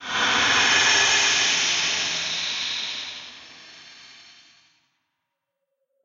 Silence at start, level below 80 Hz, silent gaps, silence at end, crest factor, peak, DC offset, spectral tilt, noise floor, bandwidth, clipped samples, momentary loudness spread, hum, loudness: 0 s; -62 dBFS; none; 1.95 s; 18 dB; -6 dBFS; under 0.1%; 1 dB/octave; -80 dBFS; 8.2 kHz; under 0.1%; 15 LU; none; -19 LUFS